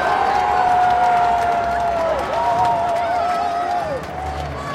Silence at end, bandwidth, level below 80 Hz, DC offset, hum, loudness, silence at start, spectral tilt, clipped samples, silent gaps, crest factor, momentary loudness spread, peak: 0 s; 13 kHz; -40 dBFS; under 0.1%; none; -18 LUFS; 0 s; -5 dB/octave; under 0.1%; none; 12 dB; 10 LU; -6 dBFS